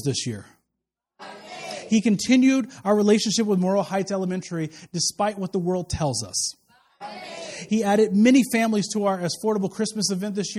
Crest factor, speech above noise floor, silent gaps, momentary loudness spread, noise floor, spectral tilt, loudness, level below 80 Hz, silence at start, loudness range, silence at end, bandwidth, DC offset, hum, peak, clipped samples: 18 dB; 61 dB; none; 17 LU; -83 dBFS; -4.5 dB/octave; -22 LUFS; -52 dBFS; 0 s; 5 LU; 0 s; 14.5 kHz; under 0.1%; none; -6 dBFS; under 0.1%